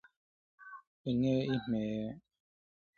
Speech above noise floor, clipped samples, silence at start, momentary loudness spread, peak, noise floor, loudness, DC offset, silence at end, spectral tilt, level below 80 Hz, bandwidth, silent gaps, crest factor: over 57 dB; under 0.1%; 0.6 s; 21 LU; -20 dBFS; under -90 dBFS; -35 LUFS; under 0.1%; 0.8 s; -8 dB/octave; -66 dBFS; 6.8 kHz; 0.87-1.05 s; 16 dB